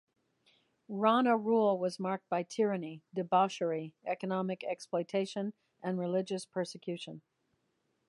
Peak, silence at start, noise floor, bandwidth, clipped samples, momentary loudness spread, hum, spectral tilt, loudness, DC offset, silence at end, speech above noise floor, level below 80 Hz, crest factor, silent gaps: -14 dBFS; 0.9 s; -79 dBFS; 11.5 kHz; under 0.1%; 13 LU; none; -6 dB/octave; -33 LUFS; under 0.1%; 0.9 s; 46 dB; -84 dBFS; 20 dB; none